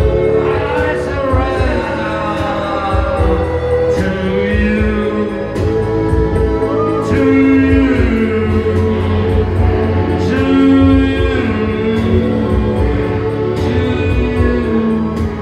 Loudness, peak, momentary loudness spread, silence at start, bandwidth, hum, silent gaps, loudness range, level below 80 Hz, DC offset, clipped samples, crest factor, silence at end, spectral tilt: -14 LUFS; 0 dBFS; 6 LU; 0 s; 10 kHz; none; none; 3 LU; -22 dBFS; under 0.1%; under 0.1%; 12 dB; 0 s; -8 dB/octave